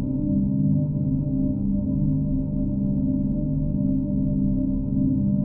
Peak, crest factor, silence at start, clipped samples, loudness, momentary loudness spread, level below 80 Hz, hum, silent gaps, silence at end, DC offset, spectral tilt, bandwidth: -12 dBFS; 10 dB; 0 s; under 0.1%; -24 LUFS; 3 LU; -32 dBFS; 50 Hz at -30 dBFS; none; 0 s; under 0.1%; -17.5 dB/octave; 1.4 kHz